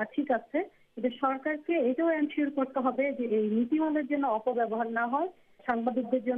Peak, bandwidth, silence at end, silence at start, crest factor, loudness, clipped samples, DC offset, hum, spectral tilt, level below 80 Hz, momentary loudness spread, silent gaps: -16 dBFS; 3.9 kHz; 0 s; 0 s; 14 dB; -30 LUFS; under 0.1%; under 0.1%; none; -8.5 dB/octave; -74 dBFS; 6 LU; none